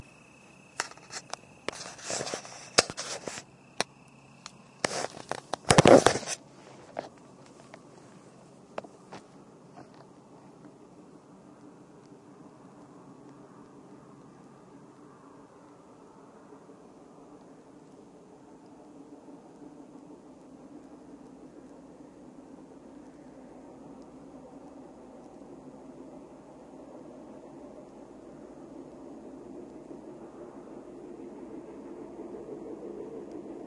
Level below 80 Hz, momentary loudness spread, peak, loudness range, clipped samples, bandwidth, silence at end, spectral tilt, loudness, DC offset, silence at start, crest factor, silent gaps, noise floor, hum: -62 dBFS; 19 LU; 0 dBFS; 27 LU; under 0.1%; 11.5 kHz; 0 s; -4 dB/octave; -29 LUFS; under 0.1%; 0 s; 34 dB; none; -55 dBFS; none